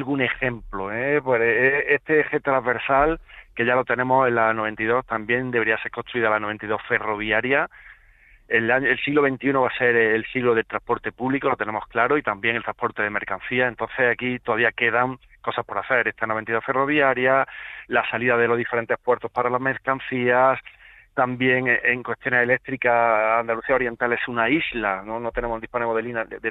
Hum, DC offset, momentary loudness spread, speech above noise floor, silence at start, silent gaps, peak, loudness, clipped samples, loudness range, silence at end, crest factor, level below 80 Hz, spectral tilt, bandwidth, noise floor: none; under 0.1%; 8 LU; 31 dB; 0 s; none; -4 dBFS; -22 LUFS; under 0.1%; 3 LU; 0 s; 18 dB; -50 dBFS; -8.5 dB/octave; 4.4 kHz; -53 dBFS